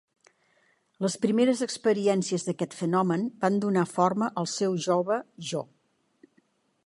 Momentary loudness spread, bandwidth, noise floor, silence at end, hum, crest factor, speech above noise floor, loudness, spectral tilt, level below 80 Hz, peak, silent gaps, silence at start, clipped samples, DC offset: 8 LU; 11.5 kHz; -68 dBFS; 1.2 s; none; 18 dB; 42 dB; -27 LUFS; -5.5 dB/octave; -76 dBFS; -8 dBFS; none; 1 s; under 0.1%; under 0.1%